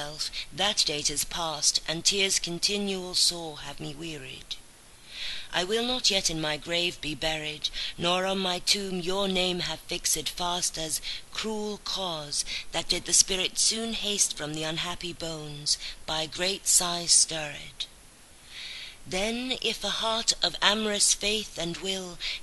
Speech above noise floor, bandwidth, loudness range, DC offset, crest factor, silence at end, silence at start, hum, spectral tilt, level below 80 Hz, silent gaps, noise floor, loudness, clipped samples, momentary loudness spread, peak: 23 dB; 12.5 kHz; 4 LU; under 0.1%; 26 dB; 0 s; 0 s; none; -1 dB/octave; -52 dBFS; none; -52 dBFS; -26 LUFS; under 0.1%; 15 LU; -4 dBFS